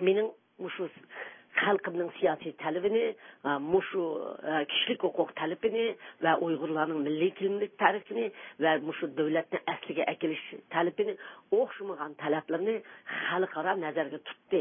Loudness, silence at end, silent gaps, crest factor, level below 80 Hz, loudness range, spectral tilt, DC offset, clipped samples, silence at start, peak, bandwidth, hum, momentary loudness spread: -31 LUFS; 0 s; none; 22 dB; -78 dBFS; 2 LU; -9 dB/octave; under 0.1%; under 0.1%; 0 s; -8 dBFS; 3.7 kHz; none; 10 LU